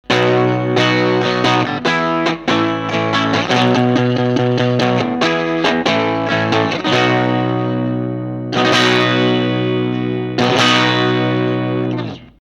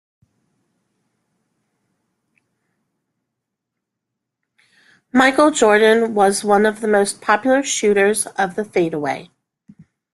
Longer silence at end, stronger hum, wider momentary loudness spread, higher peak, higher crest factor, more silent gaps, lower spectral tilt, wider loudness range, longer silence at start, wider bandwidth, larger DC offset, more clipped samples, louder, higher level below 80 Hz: second, 0.1 s vs 0.9 s; neither; about the same, 7 LU vs 8 LU; about the same, 0 dBFS vs -2 dBFS; about the same, 16 dB vs 18 dB; neither; first, -5.5 dB/octave vs -3.5 dB/octave; second, 1 LU vs 5 LU; second, 0.1 s vs 5.15 s; about the same, 11.5 kHz vs 12.5 kHz; neither; neither; about the same, -15 LUFS vs -16 LUFS; first, -50 dBFS vs -62 dBFS